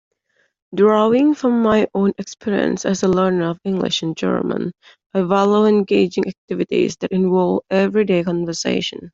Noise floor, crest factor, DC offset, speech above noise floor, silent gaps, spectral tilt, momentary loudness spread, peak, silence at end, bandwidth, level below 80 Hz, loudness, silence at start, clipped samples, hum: -65 dBFS; 14 dB; under 0.1%; 48 dB; 5.06-5.10 s, 6.38-6.48 s; -6 dB/octave; 9 LU; -2 dBFS; 0.05 s; 7.8 kHz; -56 dBFS; -18 LUFS; 0.7 s; under 0.1%; none